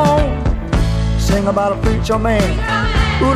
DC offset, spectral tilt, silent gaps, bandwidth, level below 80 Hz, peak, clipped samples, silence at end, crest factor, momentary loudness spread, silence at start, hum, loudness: under 0.1%; -6 dB/octave; none; 14.5 kHz; -20 dBFS; 0 dBFS; under 0.1%; 0 s; 14 dB; 3 LU; 0 s; none; -16 LUFS